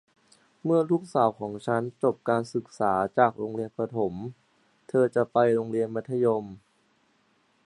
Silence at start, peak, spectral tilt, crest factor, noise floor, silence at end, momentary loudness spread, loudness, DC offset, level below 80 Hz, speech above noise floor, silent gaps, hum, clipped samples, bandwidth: 0.65 s; -6 dBFS; -7.5 dB/octave; 22 dB; -67 dBFS; 1.1 s; 10 LU; -27 LUFS; under 0.1%; -66 dBFS; 41 dB; none; none; under 0.1%; 11 kHz